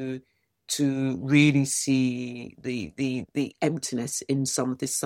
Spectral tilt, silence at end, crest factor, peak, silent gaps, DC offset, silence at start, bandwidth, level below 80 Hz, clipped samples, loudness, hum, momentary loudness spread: -4.5 dB/octave; 0 s; 20 dB; -6 dBFS; none; under 0.1%; 0 s; 16 kHz; -64 dBFS; under 0.1%; -26 LUFS; none; 13 LU